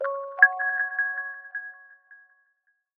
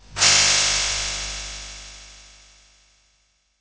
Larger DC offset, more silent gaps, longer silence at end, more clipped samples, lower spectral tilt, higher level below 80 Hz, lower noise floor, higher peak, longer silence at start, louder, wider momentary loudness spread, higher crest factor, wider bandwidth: neither; neither; second, 0.8 s vs 1.4 s; neither; about the same, 0 dB/octave vs 1 dB/octave; second, under -90 dBFS vs -42 dBFS; first, -72 dBFS vs -65 dBFS; about the same, -2 dBFS vs -2 dBFS; about the same, 0 s vs 0.1 s; second, -23 LUFS vs -17 LUFS; second, 18 LU vs 23 LU; first, 26 dB vs 20 dB; second, 3.5 kHz vs 8 kHz